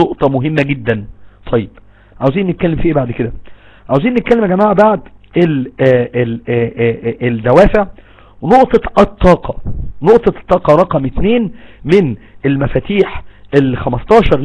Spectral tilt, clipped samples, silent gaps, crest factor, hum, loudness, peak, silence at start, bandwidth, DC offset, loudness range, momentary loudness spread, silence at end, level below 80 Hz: -8.5 dB/octave; 1%; none; 12 dB; none; -13 LUFS; 0 dBFS; 0 s; 11 kHz; under 0.1%; 4 LU; 10 LU; 0 s; -28 dBFS